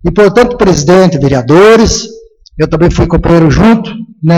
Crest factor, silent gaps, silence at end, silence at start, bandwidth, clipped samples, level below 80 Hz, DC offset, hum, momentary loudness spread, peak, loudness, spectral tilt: 6 dB; none; 0 s; 0.05 s; 12 kHz; 0.6%; -22 dBFS; under 0.1%; none; 11 LU; 0 dBFS; -7 LUFS; -6 dB/octave